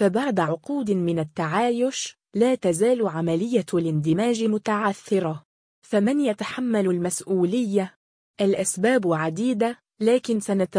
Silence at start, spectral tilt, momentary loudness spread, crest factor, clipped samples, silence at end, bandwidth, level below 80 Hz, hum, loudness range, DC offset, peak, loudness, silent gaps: 0 s; -5.5 dB/octave; 5 LU; 14 dB; under 0.1%; 0 s; 10.5 kHz; -66 dBFS; none; 1 LU; under 0.1%; -8 dBFS; -23 LUFS; 5.45-5.82 s, 7.96-8.34 s